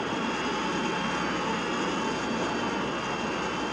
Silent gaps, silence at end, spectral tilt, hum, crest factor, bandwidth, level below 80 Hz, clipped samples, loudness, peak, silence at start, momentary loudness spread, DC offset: none; 0 s; -4 dB/octave; none; 12 dB; 11 kHz; -54 dBFS; under 0.1%; -29 LUFS; -16 dBFS; 0 s; 1 LU; under 0.1%